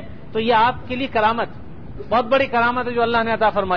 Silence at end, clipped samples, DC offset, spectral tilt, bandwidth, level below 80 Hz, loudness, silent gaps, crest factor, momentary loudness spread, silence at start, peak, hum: 0 s; under 0.1%; 2%; -7 dB/octave; 5.4 kHz; -44 dBFS; -19 LUFS; none; 14 dB; 12 LU; 0 s; -6 dBFS; none